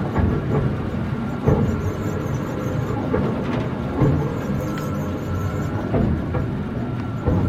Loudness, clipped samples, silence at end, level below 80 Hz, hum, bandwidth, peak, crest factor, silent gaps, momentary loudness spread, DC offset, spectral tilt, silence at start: -23 LUFS; under 0.1%; 0 s; -34 dBFS; none; 15 kHz; -4 dBFS; 18 dB; none; 6 LU; under 0.1%; -8.5 dB/octave; 0 s